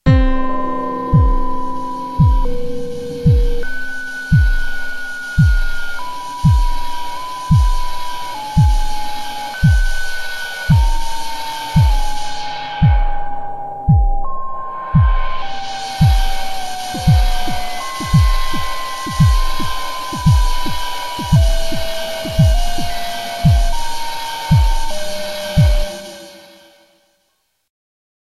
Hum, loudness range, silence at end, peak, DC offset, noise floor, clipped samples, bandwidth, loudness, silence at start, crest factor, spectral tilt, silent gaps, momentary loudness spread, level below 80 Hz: none; 2 LU; 1.85 s; 0 dBFS; under 0.1%; -66 dBFS; under 0.1%; 14 kHz; -18 LUFS; 0.05 s; 14 dB; -5.5 dB/octave; none; 11 LU; -18 dBFS